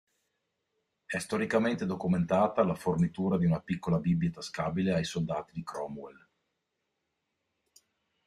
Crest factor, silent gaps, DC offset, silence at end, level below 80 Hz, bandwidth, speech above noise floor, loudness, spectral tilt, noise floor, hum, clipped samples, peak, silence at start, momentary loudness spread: 20 dB; none; under 0.1%; 2.15 s; -62 dBFS; 12.5 kHz; 53 dB; -31 LUFS; -7 dB/octave; -83 dBFS; none; under 0.1%; -12 dBFS; 1.1 s; 11 LU